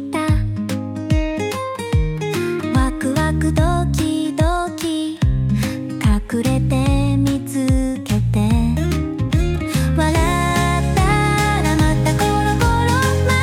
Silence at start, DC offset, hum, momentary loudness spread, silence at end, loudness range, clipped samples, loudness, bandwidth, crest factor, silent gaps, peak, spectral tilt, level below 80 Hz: 0 s; under 0.1%; none; 5 LU; 0 s; 3 LU; under 0.1%; -18 LUFS; 17 kHz; 12 dB; none; -4 dBFS; -6 dB/octave; -24 dBFS